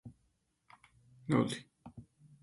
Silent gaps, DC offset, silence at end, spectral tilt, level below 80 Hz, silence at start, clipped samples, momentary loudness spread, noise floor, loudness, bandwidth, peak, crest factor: none; under 0.1%; 0.4 s; -6.5 dB/octave; -70 dBFS; 0.05 s; under 0.1%; 24 LU; -77 dBFS; -34 LUFS; 11.5 kHz; -16 dBFS; 24 dB